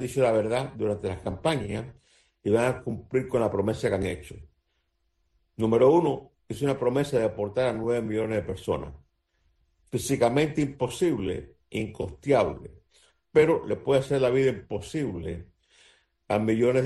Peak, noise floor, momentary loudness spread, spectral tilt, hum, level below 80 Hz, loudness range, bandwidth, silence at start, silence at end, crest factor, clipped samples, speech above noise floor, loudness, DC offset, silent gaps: -8 dBFS; -74 dBFS; 12 LU; -6.5 dB/octave; none; -52 dBFS; 3 LU; 12.5 kHz; 0 s; 0 s; 18 dB; under 0.1%; 49 dB; -27 LUFS; under 0.1%; none